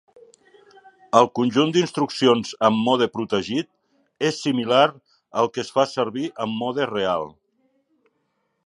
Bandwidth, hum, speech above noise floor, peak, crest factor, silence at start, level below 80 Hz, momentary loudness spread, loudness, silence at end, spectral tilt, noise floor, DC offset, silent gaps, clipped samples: 11 kHz; none; 51 dB; -2 dBFS; 22 dB; 1.15 s; -64 dBFS; 9 LU; -21 LUFS; 1.35 s; -5 dB/octave; -72 dBFS; under 0.1%; none; under 0.1%